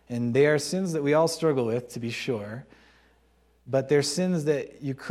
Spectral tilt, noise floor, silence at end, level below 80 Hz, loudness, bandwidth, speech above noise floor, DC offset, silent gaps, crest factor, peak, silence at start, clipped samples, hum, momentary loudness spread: -5.5 dB/octave; -63 dBFS; 0 s; -64 dBFS; -26 LUFS; 15 kHz; 38 dB; under 0.1%; none; 18 dB; -10 dBFS; 0.1 s; under 0.1%; none; 11 LU